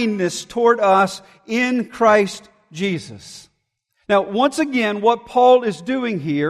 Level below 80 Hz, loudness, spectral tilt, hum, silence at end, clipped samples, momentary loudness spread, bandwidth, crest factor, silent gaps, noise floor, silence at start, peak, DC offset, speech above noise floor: -60 dBFS; -18 LUFS; -5 dB/octave; none; 0 s; under 0.1%; 17 LU; 13 kHz; 16 dB; none; -71 dBFS; 0 s; -2 dBFS; under 0.1%; 53 dB